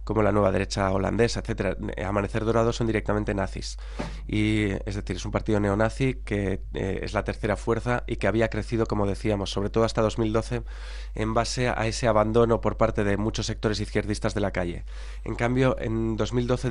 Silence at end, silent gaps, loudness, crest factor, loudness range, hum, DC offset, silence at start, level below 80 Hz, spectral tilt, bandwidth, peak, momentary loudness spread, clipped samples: 0 s; none; -26 LUFS; 18 dB; 2 LU; none; under 0.1%; 0 s; -36 dBFS; -6 dB/octave; 11 kHz; -6 dBFS; 8 LU; under 0.1%